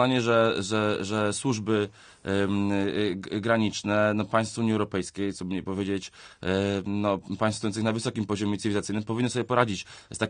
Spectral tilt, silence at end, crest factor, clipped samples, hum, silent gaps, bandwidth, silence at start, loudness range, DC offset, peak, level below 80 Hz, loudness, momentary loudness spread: -5.5 dB/octave; 0 s; 22 dB; under 0.1%; none; none; 10 kHz; 0 s; 2 LU; under 0.1%; -6 dBFS; -60 dBFS; -27 LUFS; 7 LU